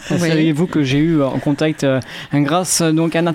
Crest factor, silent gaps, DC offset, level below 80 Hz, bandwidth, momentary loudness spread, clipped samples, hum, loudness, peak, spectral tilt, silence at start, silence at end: 12 dB; none; under 0.1%; -46 dBFS; 16.5 kHz; 4 LU; under 0.1%; none; -16 LUFS; -4 dBFS; -5 dB/octave; 0 s; 0 s